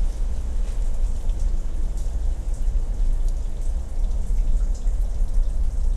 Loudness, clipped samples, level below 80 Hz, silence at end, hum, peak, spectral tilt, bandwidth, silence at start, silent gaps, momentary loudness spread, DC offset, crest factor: -29 LUFS; under 0.1%; -20 dBFS; 0 s; none; -10 dBFS; -6.5 dB/octave; 9.2 kHz; 0 s; none; 3 LU; under 0.1%; 10 dB